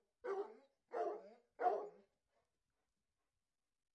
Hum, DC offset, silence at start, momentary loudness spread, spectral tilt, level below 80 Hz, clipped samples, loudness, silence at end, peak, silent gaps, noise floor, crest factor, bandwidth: none; under 0.1%; 0.25 s; 14 LU; -5 dB/octave; under -90 dBFS; under 0.1%; -45 LUFS; 2 s; -26 dBFS; none; under -90 dBFS; 22 dB; 8.4 kHz